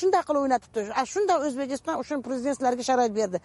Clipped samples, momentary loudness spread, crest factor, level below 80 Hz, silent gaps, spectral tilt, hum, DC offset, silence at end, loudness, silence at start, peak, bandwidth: under 0.1%; 6 LU; 16 dB; -64 dBFS; none; -4 dB/octave; none; under 0.1%; 0.05 s; -26 LUFS; 0 s; -10 dBFS; 11.5 kHz